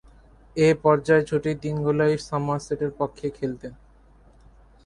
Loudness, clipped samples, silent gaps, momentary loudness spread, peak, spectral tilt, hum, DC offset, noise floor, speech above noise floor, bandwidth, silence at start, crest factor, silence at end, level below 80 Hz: -23 LUFS; under 0.1%; none; 12 LU; -6 dBFS; -7 dB/octave; none; under 0.1%; -53 dBFS; 31 dB; 11 kHz; 0.55 s; 20 dB; 1.1 s; -52 dBFS